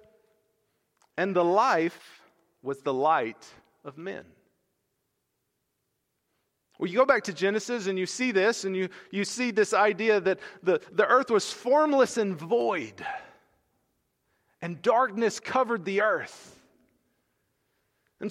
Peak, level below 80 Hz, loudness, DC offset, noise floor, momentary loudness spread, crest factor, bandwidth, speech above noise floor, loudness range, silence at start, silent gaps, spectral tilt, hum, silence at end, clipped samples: -8 dBFS; -76 dBFS; -26 LUFS; under 0.1%; -79 dBFS; 16 LU; 22 dB; 13.5 kHz; 53 dB; 8 LU; 1.15 s; none; -4.5 dB/octave; none; 0 s; under 0.1%